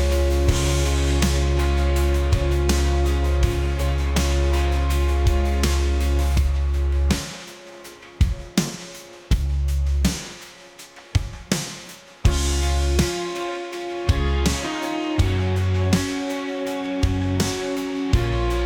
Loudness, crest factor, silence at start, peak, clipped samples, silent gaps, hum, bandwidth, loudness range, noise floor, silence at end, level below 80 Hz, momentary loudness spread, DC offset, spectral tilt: -22 LUFS; 16 dB; 0 s; -6 dBFS; under 0.1%; none; none; 18 kHz; 5 LU; -44 dBFS; 0 s; -24 dBFS; 11 LU; under 0.1%; -5.5 dB/octave